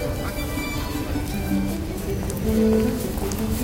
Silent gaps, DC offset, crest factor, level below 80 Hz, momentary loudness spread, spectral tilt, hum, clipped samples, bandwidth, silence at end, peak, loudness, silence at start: none; under 0.1%; 16 dB; -32 dBFS; 8 LU; -6 dB/octave; none; under 0.1%; 17 kHz; 0 s; -8 dBFS; -25 LUFS; 0 s